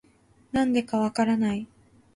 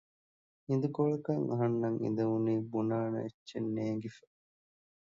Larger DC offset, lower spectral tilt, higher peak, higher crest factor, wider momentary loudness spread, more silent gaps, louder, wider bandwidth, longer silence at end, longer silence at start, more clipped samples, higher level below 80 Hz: neither; second, -6 dB/octave vs -9.5 dB/octave; first, -12 dBFS vs -18 dBFS; about the same, 16 dB vs 16 dB; about the same, 9 LU vs 8 LU; second, none vs 3.34-3.46 s; first, -26 LUFS vs -34 LUFS; first, 11.5 kHz vs 7.4 kHz; second, 0.5 s vs 0.85 s; second, 0.55 s vs 0.7 s; neither; first, -58 dBFS vs -76 dBFS